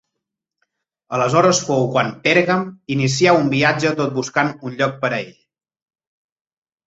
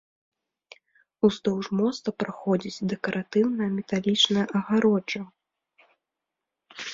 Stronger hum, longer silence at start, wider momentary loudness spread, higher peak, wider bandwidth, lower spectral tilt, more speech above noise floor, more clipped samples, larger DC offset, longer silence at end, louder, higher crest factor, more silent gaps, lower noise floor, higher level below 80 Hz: neither; second, 1.1 s vs 1.25 s; second, 8 LU vs 11 LU; first, -2 dBFS vs -8 dBFS; about the same, 8 kHz vs 7.6 kHz; about the same, -4.5 dB/octave vs -5 dB/octave; about the same, 63 dB vs 61 dB; neither; neither; first, 1.55 s vs 0 s; first, -18 LUFS vs -25 LUFS; about the same, 18 dB vs 20 dB; neither; second, -80 dBFS vs -86 dBFS; first, -58 dBFS vs -66 dBFS